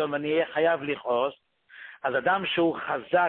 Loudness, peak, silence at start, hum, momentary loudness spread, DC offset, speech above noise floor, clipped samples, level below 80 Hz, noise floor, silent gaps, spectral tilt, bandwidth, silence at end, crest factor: -26 LUFS; -10 dBFS; 0 s; none; 8 LU; under 0.1%; 22 dB; under 0.1%; -68 dBFS; -48 dBFS; none; -9 dB/octave; 4.3 kHz; 0 s; 16 dB